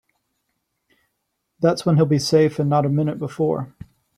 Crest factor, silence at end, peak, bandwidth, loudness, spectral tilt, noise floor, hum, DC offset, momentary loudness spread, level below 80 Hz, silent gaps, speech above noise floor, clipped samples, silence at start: 18 dB; 0.5 s; -4 dBFS; 14 kHz; -20 LUFS; -7 dB/octave; -75 dBFS; none; under 0.1%; 7 LU; -58 dBFS; none; 57 dB; under 0.1%; 1.6 s